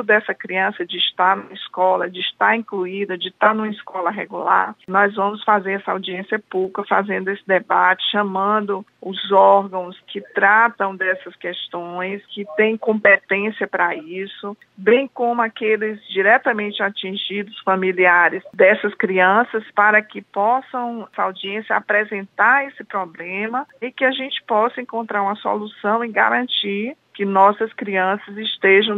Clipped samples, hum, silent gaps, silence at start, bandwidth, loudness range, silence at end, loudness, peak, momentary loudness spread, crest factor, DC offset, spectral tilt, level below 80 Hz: under 0.1%; none; none; 0 s; 4.4 kHz; 4 LU; 0 s; -19 LUFS; -2 dBFS; 12 LU; 18 dB; under 0.1%; -6.5 dB/octave; -76 dBFS